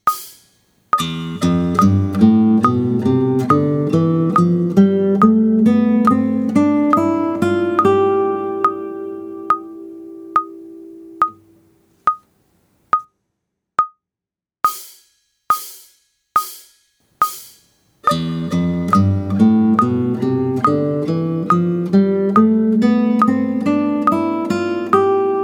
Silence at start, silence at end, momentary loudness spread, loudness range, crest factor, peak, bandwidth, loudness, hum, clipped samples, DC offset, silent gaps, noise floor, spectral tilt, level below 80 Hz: 0.05 s; 0 s; 9 LU; 10 LU; 16 dB; 0 dBFS; over 20 kHz; -16 LUFS; none; under 0.1%; under 0.1%; none; -88 dBFS; -7.5 dB/octave; -54 dBFS